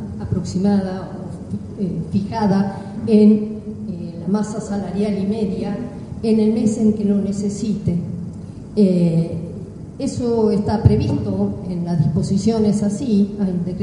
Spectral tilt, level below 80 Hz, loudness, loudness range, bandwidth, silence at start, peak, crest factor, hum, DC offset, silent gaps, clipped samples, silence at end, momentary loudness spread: -8 dB/octave; -42 dBFS; -19 LUFS; 2 LU; 10.5 kHz; 0 s; 0 dBFS; 18 dB; none; under 0.1%; none; under 0.1%; 0 s; 13 LU